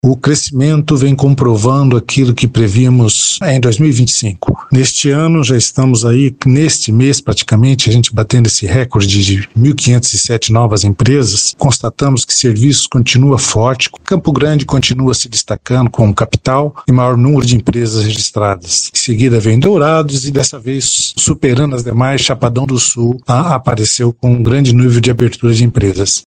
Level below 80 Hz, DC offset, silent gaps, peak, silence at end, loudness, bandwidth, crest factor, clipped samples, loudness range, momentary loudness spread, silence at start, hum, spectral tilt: -36 dBFS; under 0.1%; none; 0 dBFS; 0.05 s; -10 LUFS; 10 kHz; 10 dB; under 0.1%; 2 LU; 4 LU; 0.05 s; none; -5 dB/octave